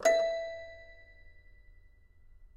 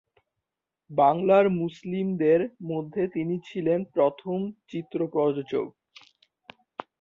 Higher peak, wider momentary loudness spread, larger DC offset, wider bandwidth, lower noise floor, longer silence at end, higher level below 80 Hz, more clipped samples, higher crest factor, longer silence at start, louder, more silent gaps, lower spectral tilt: second, -14 dBFS vs -8 dBFS; first, 26 LU vs 13 LU; neither; first, 14 kHz vs 7.2 kHz; second, -59 dBFS vs -86 dBFS; second, 0.1 s vs 1.3 s; first, -58 dBFS vs -68 dBFS; neither; about the same, 20 dB vs 20 dB; second, 0 s vs 0.9 s; second, -33 LUFS vs -26 LUFS; neither; second, -1.5 dB/octave vs -9 dB/octave